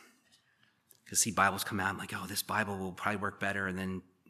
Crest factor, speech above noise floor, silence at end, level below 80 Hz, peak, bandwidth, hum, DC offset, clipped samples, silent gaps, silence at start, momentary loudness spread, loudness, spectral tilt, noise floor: 24 dB; 37 dB; 0.3 s; -72 dBFS; -10 dBFS; 15 kHz; none; under 0.1%; under 0.1%; none; 1.05 s; 8 LU; -33 LUFS; -3 dB/octave; -71 dBFS